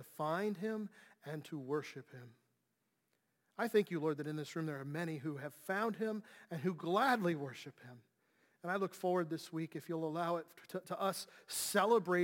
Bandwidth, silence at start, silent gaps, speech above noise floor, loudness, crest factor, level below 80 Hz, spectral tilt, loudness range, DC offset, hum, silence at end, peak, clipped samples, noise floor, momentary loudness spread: 17 kHz; 0 s; none; 45 dB; -39 LUFS; 22 dB; -90 dBFS; -5 dB/octave; 4 LU; under 0.1%; none; 0 s; -18 dBFS; under 0.1%; -84 dBFS; 16 LU